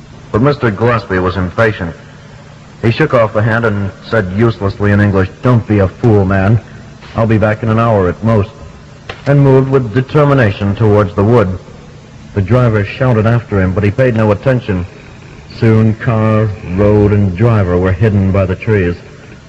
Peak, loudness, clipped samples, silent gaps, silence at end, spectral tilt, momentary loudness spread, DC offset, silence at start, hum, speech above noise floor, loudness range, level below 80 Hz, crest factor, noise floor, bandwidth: 0 dBFS; -12 LUFS; 1%; none; 0.1 s; -9 dB/octave; 9 LU; under 0.1%; 0.15 s; none; 24 dB; 3 LU; -34 dBFS; 12 dB; -34 dBFS; 7.6 kHz